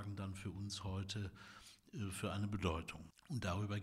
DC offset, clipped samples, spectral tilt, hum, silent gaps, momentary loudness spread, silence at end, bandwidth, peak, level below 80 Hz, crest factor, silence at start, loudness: under 0.1%; under 0.1%; -5.5 dB/octave; none; none; 14 LU; 0 s; 15 kHz; -26 dBFS; -64 dBFS; 18 dB; 0 s; -44 LUFS